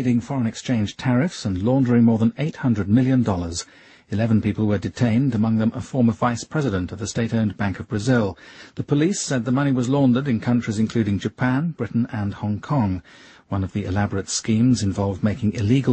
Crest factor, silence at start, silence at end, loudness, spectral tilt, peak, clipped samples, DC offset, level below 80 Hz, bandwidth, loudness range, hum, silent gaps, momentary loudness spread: 16 dB; 0 s; 0 s; -22 LUFS; -6.5 dB/octave; -6 dBFS; under 0.1%; under 0.1%; -50 dBFS; 8.8 kHz; 3 LU; none; none; 8 LU